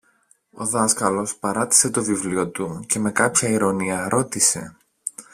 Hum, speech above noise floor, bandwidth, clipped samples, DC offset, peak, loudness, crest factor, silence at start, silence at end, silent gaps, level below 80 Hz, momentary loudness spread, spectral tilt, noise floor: none; 39 dB; 16 kHz; under 0.1%; under 0.1%; 0 dBFS; -20 LUFS; 22 dB; 0.55 s; 0.1 s; none; -58 dBFS; 13 LU; -3 dB/octave; -61 dBFS